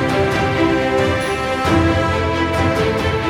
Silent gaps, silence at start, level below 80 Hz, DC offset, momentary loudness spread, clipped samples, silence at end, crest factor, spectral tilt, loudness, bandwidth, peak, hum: none; 0 s; -32 dBFS; under 0.1%; 3 LU; under 0.1%; 0 s; 14 dB; -6 dB/octave; -17 LUFS; 17.5 kHz; -4 dBFS; none